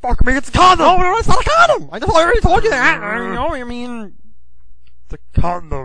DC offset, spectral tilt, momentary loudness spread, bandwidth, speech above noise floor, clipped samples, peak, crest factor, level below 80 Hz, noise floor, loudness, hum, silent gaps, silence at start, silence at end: 4%; -4.5 dB/octave; 14 LU; 10 kHz; 34 dB; under 0.1%; 0 dBFS; 14 dB; -24 dBFS; -47 dBFS; -14 LUFS; none; none; 0 s; 0 s